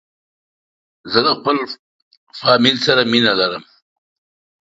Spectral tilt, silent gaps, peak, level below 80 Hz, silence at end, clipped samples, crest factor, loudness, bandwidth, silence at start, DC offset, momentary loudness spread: -4.5 dB/octave; 1.79-2.11 s, 2.17-2.27 s; 0 dBFS; -60 dBFS; 1.05 s; under 0.1%; 20 dB; -15 LUFS; 7.8 kHz; 1.05 s; under 0.1%; 13 LU